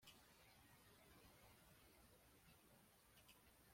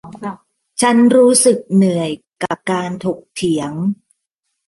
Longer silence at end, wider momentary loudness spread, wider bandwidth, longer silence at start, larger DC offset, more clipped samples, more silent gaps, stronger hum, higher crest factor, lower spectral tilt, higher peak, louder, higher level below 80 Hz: second, 0 s vs 0.75 s; second, 1 LU vs 19 LU; first, 16.5 kHz vs 11.5 kHz; about the same, 0 s vs 0.05 s; neither; neither; neither; neither; about the same, 20 dB vs 16 dB; second, -3 dB/octave vs -4.5 dB/octave; second, -52 dBFS vs -2 dBFS; second, -69 LUFS vs -15 LUFS; second, -82 dBFS vs -60 dBFS